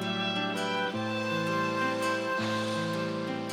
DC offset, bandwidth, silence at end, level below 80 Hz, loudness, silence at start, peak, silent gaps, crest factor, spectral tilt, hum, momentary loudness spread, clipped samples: under 0.1%; 16 kHz; 0 s; -76 dBFS; -30 LUFS; 0 s; -18 dBFS; none; 12 dB; -4.5 dB/octave; none; 3 LU; under 0.1%